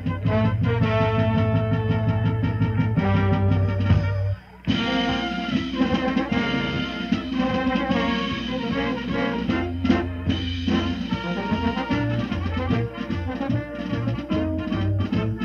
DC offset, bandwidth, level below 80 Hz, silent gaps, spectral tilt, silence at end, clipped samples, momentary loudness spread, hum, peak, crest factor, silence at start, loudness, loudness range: under 0.1%; 6.8 kHz; -38 dBFS; none; -7.5 dB/octave; 0 s; under 0.1%; 6 LU; none; -6 dBFS; 16 dB; 0 s; -24 LUFS; 4 LU